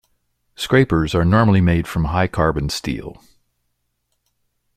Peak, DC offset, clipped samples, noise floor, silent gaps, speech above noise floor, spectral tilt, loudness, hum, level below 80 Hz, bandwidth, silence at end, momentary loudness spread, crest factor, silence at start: -2 dBFS; under 0.1%; under 0.1%; -71 dBFS; none; 54 dB; -6.5 dB/octave; -18 LUFS; none; -36 dBFS; 15 kHz; 1.65 s; 13 LU; 18 dB; 0.6 s